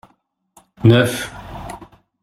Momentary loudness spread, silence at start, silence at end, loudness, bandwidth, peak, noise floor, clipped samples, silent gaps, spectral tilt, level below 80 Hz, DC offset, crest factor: 21 LU; 0.8 s; 0.4 s; -16 LUFS; 14.5 kHz; -2 dBFS; -62 dBFS; under 0.1%; none; -6 dB/octave; -46 dBFS; under 0.1%; 18 dB